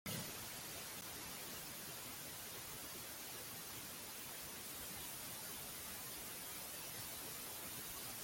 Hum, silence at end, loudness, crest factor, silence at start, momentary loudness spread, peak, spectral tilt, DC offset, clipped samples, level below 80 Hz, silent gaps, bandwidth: none; 0 s; -47 LUFS; 16 dB; 0.05 s; 2 LU; -32 dBFS; -1.5 dB/octave; under 0.1%; under 0.1%; -72 dBFS; none; 17 kHz